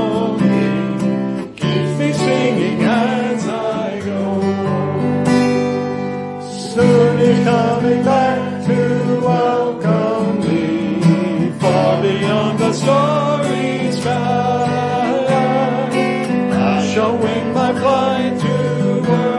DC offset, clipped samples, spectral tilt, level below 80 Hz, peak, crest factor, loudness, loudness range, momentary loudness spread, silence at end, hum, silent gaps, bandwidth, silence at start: under 0.1%; under 0.1%; -6.5 dB/octave; -56 dBFS; 0 dBFS; 14 dB; -16 LUFS; 2 LU; 5 LU; 0 s; none; none; 11.5 kHz; 0 s